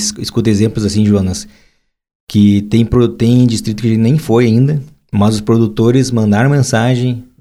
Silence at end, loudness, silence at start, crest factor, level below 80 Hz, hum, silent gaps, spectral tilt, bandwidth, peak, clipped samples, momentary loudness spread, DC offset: 0.15 s; -12 LUFS; 0 s; 12 dB; -38 dBFS; none; 2.15-2.27 s; -6.5 dB/octave; 13.5 kHz; 0 dBFS; under 0.1%; 5 LU; under 0.1%